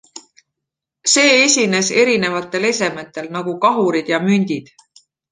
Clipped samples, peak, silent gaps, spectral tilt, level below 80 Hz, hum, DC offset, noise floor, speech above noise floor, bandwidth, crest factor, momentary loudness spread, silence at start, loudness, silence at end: under 0.1%; 0 dBFS; none; -3 dB/octave; -64 dBFS; none; under 0.1%; -82 dBFS; 66 dB; 10 kHz; 16 dB; 14 LU; 0.15 s; -15 LUFS; 0.7 s